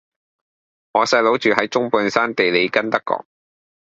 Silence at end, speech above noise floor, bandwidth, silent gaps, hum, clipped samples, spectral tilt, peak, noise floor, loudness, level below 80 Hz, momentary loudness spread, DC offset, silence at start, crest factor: 0.75 s; over 72 dB; 7.8 kHz; none; none; under 0.1%; -4 dB/octave; 0 dBFS; under -90 dBFS; -18 LUFS; -62 dBFS; 7 LU; under 0.1%; 0.95 s; 20 dB